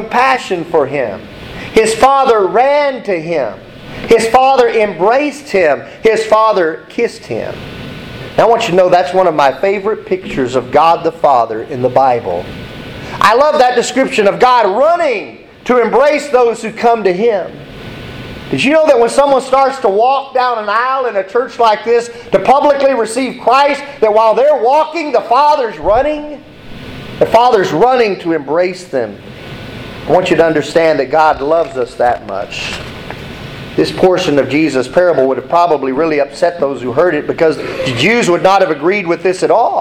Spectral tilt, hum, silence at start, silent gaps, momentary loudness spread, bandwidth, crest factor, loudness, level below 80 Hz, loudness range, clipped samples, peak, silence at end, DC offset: -5 dB/octave; none; 0 s; none; 17 LU; 15.5 kHz; 12 dB; -12 LUFS; -42 dBFS; 3 LU; under 0.1%; 0 dBFS; 0 s; under 0.1%